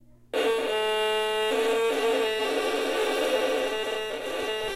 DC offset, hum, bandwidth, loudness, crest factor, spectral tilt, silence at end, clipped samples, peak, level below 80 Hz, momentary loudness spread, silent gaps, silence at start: under 0.1%; none; 16 kHz; -26 LUFS; 14 dB; -2 dB/octave; 0 s; under 0.1%; -14 dBFS; -60 dBFS; 5 LU; none; 0.35 s